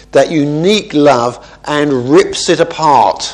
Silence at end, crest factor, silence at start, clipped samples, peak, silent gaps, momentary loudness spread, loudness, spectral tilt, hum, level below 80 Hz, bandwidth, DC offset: 0 s; 10 dB; 0.15 s; 0.4%; 0 dBFS; none; 6 LU; -11 LUFS; -4.5 dB/octave; none; -44 dBFS; 11 kHz; under 0.1%